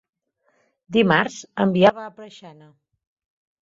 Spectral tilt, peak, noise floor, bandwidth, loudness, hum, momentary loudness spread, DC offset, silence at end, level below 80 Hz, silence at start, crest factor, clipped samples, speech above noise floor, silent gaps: -6 dB/octave; -2 dBFS; -67 dBFS; 7.8 kHz; -19 LUFS; none; 22 LU; under 0.1%; 1.1 s; -62 dBFS; 0.9 s; 22 dB; under 0.1%; 47 dB; none